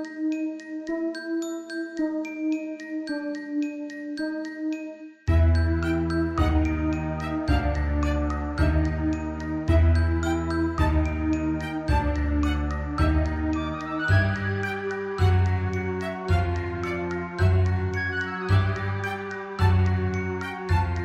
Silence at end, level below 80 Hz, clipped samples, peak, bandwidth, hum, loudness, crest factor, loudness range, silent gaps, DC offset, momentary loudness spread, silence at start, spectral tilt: 0 s; -32 dBFS; under 0.1%; -8 dBFS; 8.8 kHz; none; -26 LUFS; 16 dB; 6 LU; none; under 0.1%; 9 LU; 0 s; -7.5 dB/octave